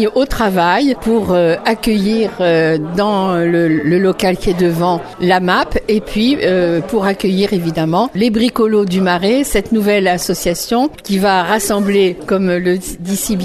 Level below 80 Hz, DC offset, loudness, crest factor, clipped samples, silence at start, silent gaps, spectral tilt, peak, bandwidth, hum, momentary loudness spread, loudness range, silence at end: -34 dBFS; under 0.1%; -14 LUFS; 14 dB; under 0.1%; 0 s; none; -5 dB/octave; 0 dBFS; 13.5 kHz; none; 4 LU; 1 LU; 0 s